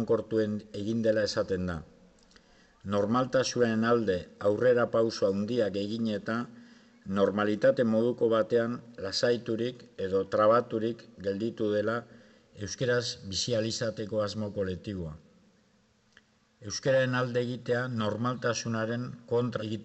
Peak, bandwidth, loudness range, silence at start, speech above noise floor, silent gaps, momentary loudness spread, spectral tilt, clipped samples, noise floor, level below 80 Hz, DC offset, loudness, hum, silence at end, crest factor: -12 dBFS; 8.4 kHz; 5 LU; 0 s; 38 dB; none; 11 LU; -5.5 dB/octave; under 0.1%; -67 dBFS; -66 dBFS; under 0.1%; -29 LUFS; none; 0 s; 16 dB